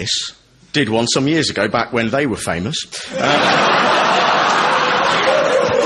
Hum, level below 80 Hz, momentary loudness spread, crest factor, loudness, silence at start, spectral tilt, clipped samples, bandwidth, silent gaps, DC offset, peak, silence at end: none; -50 dBFS; 8 LU; 14 dB; -15 LUFS; 0 s; -3.5 dB/octave; under 0.1%; 11.5 kHz; none; under 0.1%; -2 dBFS; 0 s